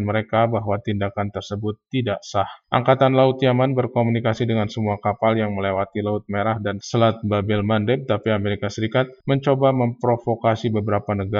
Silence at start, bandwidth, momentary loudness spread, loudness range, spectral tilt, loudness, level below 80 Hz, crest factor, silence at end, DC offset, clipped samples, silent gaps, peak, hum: 0 s; 7.4 kHz; 7 LU; 2 LU; -7 dB/octave; -21 LUFS; -56 dBFS; 18 dB; 0 s; under 0.1%; under 0.1%; none; -2 dBFS; none